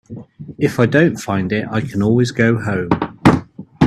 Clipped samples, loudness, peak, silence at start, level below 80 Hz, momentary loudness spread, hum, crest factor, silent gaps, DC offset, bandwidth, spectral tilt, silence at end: under 0.1%; -16 LUFS; 0 dBFS; 0.1 s; -44 dBFS; 8 LU; none; 16 dB; none; under 0.1%; 13.5 kHz; -7 dB/octave; 0 s